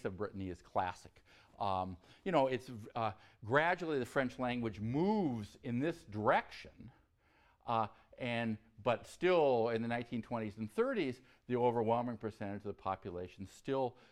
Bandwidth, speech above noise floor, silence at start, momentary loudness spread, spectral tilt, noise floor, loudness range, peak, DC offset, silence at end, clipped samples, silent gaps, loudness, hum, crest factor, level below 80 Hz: 13.5 kHz; 34 dB; 0.05 s; 13 LU; -7 dB/octave; -71 dBFS; 3 LU; -16 dBFS; under 0.1%; 0.2 s; under 0.1%; none; -37 LUFS; none; 20 dB; -68 dBFS